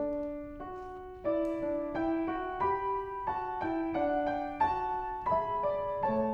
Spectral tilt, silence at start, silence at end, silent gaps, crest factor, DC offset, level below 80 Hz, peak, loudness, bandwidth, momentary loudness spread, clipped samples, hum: -8 dB/octave; 0 s; 0 s; none; 16 dB; under 0.1%; -54 dBFS; -18 dBFS; -33 LUFS; 6.8 kHz; 9 LU; under 0.1%; none